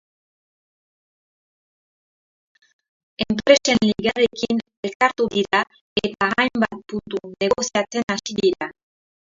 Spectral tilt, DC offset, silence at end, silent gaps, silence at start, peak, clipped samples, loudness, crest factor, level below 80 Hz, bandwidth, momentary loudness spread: -3.5 dB/octave; under 0.1%; 0.65 s; 4.77-4.83 s, 4.95-5.00 s, 5.81-5.96 s; 3.2 s; 0 dBFS; under 0.1%; -21 LUFS; 22 dB; -54 dBFS; 7.8 kHz; 13 LU